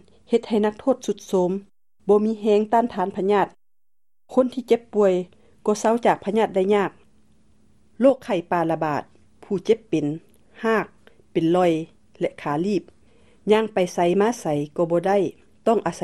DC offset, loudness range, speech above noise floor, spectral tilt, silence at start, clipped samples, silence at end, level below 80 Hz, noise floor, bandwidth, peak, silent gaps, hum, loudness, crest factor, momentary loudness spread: 0.2%; 3 LU; 67 dB; -6 dB/octave; 0.3 s; under 0.1%; 0 s; -62 dBFS; -88 dBFS; 12.5 kHz; -4 dBFS; none; none; -22 LUFS; 18 dB; 9 LU